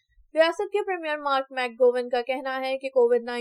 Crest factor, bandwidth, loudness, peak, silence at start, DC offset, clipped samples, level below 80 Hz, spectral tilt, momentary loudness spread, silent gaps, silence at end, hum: 18 dB; 11.5 kHz; -25 LUFS; -8 dBFS; 0.35 s; under 0.1%; under 0.1%; -70 dBFS; -2.5 dB/octave; 7 LU; none; 0 s; none